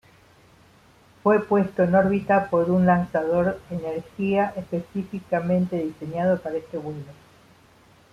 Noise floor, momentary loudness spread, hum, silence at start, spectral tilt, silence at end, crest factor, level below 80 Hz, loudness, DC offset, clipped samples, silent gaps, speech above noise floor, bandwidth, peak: -55 dBFS; 12 LU; none; 1.25 s; -9 dB/octave; 1 s; 18 dB; -56 dBFS; -23 LUFS; under 0.1%; under 0.1%; none; 32 dB; 7 kHz; -6 dBFS